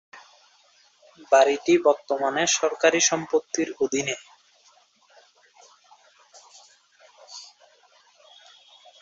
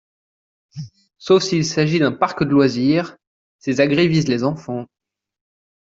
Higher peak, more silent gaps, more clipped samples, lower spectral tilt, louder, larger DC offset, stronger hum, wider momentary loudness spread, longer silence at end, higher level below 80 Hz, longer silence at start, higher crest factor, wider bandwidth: about the same, -4 dBFS vs -2 dBFS; second, none vs 3.27-3.59 s; neither; second, -2 dB/octave vs -6 dB/octave; second, -22 LUFS vs -18 LUFS; neither; neither; about the same, 20 LU vs 20 LU; first, 1.55 s vs 1 s; second, -72 dBFS vs -56 dBFS; second, 0.15 s vs 0.75 s; first, 22 dB vs 16 dB; about the same, 8 kHz vs 7.8 kHz